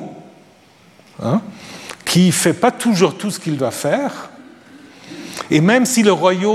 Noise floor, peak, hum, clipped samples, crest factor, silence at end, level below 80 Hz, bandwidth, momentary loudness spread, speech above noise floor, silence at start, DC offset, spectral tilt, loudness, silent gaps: -48 dBFS; 0 dBFS; none; under 0.1%; 18 dB; 0 s; -62 dBFS; 15 kHz; 20 LU; 33 dB; 0 s; under 0.1%; -5 dB/octave; -16 LUFS; none